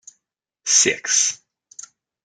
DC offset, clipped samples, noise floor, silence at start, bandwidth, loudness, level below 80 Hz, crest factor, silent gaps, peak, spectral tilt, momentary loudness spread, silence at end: under 0.1%; under 0.1%; -77 dBFS; 0.65 s; 11 kHz; -16 LUFS; -74 dBFS; 20 dB; none; -2 dBFS; 0.5 dB/octave; 25 LU; 0.9 s